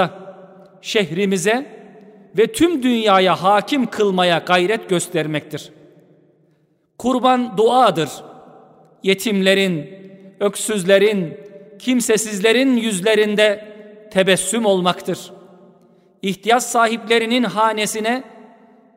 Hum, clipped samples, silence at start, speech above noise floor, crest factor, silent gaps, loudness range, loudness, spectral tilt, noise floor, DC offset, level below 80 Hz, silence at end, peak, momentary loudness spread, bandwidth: none; under 0.1%; 0 s; 44 dB; 16 dB; none; 3 LU; -17 LUFS; -4 dB/octave; -61 dBFS; under 0.1%; -60 dBFS; 0.55 s; -2 dBFS; 13 LU; 16 kHz